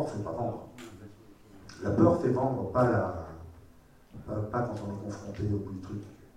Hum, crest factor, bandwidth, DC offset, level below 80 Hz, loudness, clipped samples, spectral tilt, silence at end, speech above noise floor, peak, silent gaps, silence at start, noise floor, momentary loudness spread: none; 22 dB; 11 kHz; under 0.1%; -54 dBFS; -31 LUFS; under 0.1%; -8.5 dB/octave; 0.1 s; 27 dB; -10 dBFS; none; 0 s; -57 dBFS; 24 LU